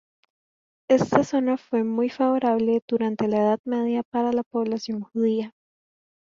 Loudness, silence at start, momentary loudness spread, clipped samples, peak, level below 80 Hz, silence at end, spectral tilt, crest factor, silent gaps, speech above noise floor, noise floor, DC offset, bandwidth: -24 LUFS; 0.9 s; 6 LU; under 0.1%; -2 dBFS; -64 dBFS; 0.85 s; -6.5 dB/octave; 22 dB; 2.82-2.88 s, 3.59-3.64 s, 4.05-4.12 s, 4.46-4.51 s; over 67 dB; under -90 dBFS; under 0.1%; 7.4 kHz